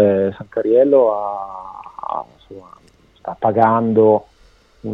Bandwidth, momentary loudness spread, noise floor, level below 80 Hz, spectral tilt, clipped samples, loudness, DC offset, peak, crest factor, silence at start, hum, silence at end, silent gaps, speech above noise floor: 5.6 kHz; 20 LU; -51 dBFS; -56 dBFS; -10 dB/octave; under 0.1%; -16 LUFS; under 0.1%; 0 dBFS; 18 dB; 0 s; none; 0 s; none; 35 dB